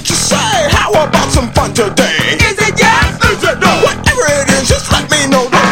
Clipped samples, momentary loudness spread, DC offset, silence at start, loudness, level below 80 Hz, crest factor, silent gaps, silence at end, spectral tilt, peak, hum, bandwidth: 0.3%; 3 LU; under 0.1%; 0 s; -10 LUFS; -24 dBFS; 10 dB; none; 0 s; -3.5 dB/octave; 0 dBFS; none; 17 kHz